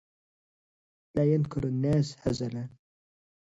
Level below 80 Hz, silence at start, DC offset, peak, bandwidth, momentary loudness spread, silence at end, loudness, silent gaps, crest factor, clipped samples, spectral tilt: -54 dBFS; 1.15 s; under 0.1%; -14 dBFS; 8 kHz; 10 LU; 0.9 s; -29 LUFS; none; 16 dB; under 0.1%; -8 dB/octave